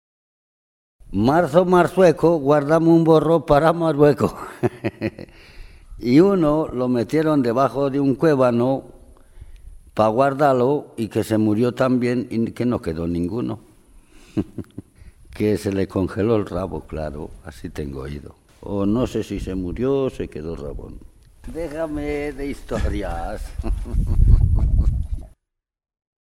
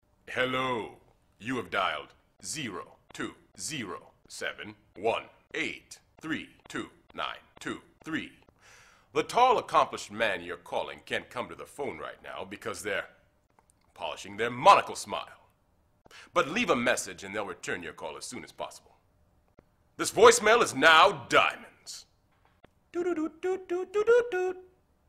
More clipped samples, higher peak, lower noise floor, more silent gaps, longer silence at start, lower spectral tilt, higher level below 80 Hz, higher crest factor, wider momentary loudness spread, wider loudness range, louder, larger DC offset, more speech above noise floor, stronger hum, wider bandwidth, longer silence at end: neither; first, 0 dBFS vs -4 dBFS; first, -80 dBFS vs -68 dBFS; neither; first, 1.05 s vs 0.3 s; first, -8 dB/octave vs -2.5 dB/octave; first, -30 dBFS vs -64 dBFS; second, 20 dB vs 26 dB; second, 16 LU vs 21 LU; second, 10 LU vs 14 LU; first, -20 LUFS vs -28 LUFS; neither; first, 61 dB vs 40 dB; neither; about the same, 15 kHz vs 15.5 kHz; first, 1.05 s vs 0.45 s